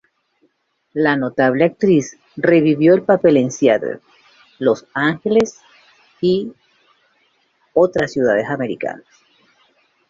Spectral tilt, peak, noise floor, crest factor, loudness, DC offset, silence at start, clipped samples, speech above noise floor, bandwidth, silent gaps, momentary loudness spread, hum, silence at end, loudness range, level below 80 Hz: -6 dB/octave; 0 dBFS; -64 dBFS; 18 dB; -17 LUFS; under 0.1%; 0.95 s; under 0.1%; 49 dB; 7.6 kHz; none; 13 LU; none; 1.15 s; 6 LU; -58 dBFS